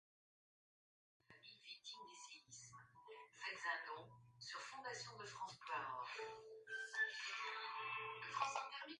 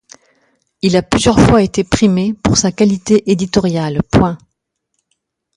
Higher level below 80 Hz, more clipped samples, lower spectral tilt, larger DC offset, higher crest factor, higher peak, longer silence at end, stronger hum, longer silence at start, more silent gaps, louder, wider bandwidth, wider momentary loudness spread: second, under -90 dBFS vs -32 dBFS; neither; second, -1 dB/octave vs -5.5 dB/octave; neither; first, 22 dB vs 14 dB; second, -28 dBFS vs 0 dBFS; second, 0 s vs 1.2 s; neither; first, 1.3 s vs 0.85 s; neither; second, -48 LUFS vs -13 LUFS; about the same, 11 kHz vs 11.5 kHz; first, 17 LU vs 7 LU